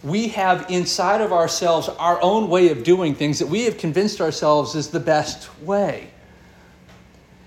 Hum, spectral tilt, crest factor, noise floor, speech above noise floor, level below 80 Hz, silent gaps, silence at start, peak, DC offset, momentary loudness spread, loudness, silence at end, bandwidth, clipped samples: none; -4.5 dB/octave; 16 dB; -48 dBFS; 29 dB; -54 dBFS; none; 0.05 s; -4 dBFS; under 0.1%; 7 LU; -19 LUFS; 1.4 s; 15.5 kHz; under 0.1%